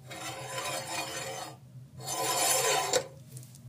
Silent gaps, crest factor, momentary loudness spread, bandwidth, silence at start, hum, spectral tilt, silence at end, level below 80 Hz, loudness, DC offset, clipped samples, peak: none; 20 dB; 22 LU; 15.5 kHz; 0 s; none; -1 dB/octave; 0 s; -72 dBFS; -30 LUFS; under 0.1%; under 0.1%; -14 dBFS